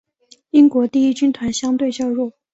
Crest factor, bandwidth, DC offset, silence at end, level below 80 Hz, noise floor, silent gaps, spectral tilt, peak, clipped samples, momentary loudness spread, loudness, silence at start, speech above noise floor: 14 dB; 8 kHz; under 0.1%; 0.25 s; -56 dBFS; -45 dBFS; none; -4.5 dB/octave; -2 dBFS; under 0.1%; 8 LU; -17 LUFS; 0.55 s; 29 dB